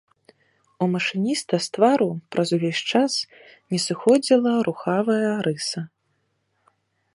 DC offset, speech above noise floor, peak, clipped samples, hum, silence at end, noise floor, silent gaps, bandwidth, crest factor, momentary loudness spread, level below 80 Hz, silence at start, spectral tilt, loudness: under 0.1%; 49 dB; -4 dBFS; under 0.1%; none; 1.25 s; -71 dBFS; none; 11.5 kHz; 20 dB; 9 LU; -70 dBFS; 0.8 s; -5 dB/octave; -22 LUFS